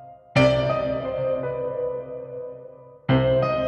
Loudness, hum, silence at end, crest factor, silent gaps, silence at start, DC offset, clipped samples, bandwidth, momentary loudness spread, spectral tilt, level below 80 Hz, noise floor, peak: -23 LUFS; none; 0 s; 18 dB; none; 0 s; under 0.1%; under 0.1%; 9 kHz; 16 LU; -7.5 dB/octave; -46 dBFS; -44 dBFS; -6 dBFS